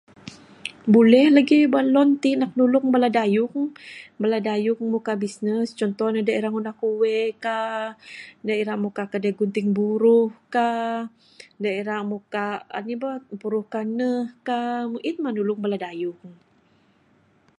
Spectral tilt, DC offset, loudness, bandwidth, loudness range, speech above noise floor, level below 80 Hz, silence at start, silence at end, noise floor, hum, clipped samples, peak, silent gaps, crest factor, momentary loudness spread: -6.5 dB/octave; under 0.1%; -22 LUFS; 11 kHz; 9 LU; 39 dB; -74 dBFS; 0.25 s; 1.25 s; -60 dBFS; none; under 0.1%; -4 dBFS; none; 20 dB; 14 LU